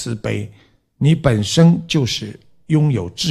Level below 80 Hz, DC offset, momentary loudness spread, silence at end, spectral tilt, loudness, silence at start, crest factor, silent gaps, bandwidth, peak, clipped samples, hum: -44 dBFS; under 0.1%; 12 LU; 0 s; -6 dB/octave; -17 LUFS; 0 s; 16 dB; none; 13 kHz; 0 dBFS; under 0.1%; none